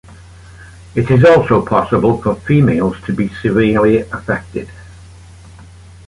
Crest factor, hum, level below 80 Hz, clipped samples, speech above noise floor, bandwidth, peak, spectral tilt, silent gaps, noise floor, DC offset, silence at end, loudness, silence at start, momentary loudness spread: 14 dB; none; -38 dBFS; under 0.1%; 25 dB; 11.5 kHz; -2 dBFS; -8.5 dB/octave; none; -38 dBFS; under 0.1%; 1.15 s; -13 LUFS; 0.1 s; 12 LU